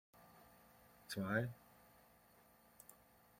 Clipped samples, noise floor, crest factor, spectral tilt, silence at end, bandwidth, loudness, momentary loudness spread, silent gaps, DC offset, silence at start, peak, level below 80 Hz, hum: under 0.1%; -69 dBFS; 26 dB; -5.5 dB/octave; 0.45 s; 16.5 kHz; -43 LUFS; 27 LU; none; under 0.1%; 0.15 s; -24 dBFS; -78 dBFS; none